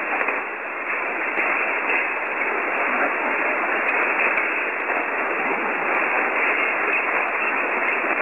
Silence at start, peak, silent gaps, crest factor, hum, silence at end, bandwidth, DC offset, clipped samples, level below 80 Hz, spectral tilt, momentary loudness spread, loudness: 0 s; -8 dBFS; none; 16 dB; none; 0 s; 16 kHz; 0.2%; under 0.1%; -70 dBFS; -5 dB/octave; 4 LU; -21 LUFS